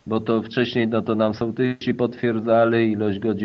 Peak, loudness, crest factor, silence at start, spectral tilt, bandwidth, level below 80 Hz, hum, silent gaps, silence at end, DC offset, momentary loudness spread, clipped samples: -6 dBFS; -21 LUFS; 16 dB; 0.05 s; -8.5 dB/octave; 6.2 kHz; -60 dBFS; none; none; 0 s; under 0.1%; 5 LU; under 0.1%